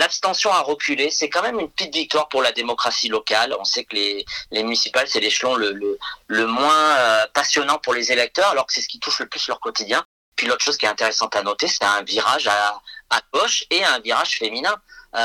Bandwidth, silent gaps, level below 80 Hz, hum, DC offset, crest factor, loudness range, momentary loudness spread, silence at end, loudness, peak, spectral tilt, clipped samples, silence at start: 16 kHz; 10.05-10.32 s; -62 dBFS; none; under 0.1%; 20 dB; 2 LU; 7 LU; 0 s; -19 LUFS; 0 dBFS; -0.5 dB/octave; under 0.1%; 0 s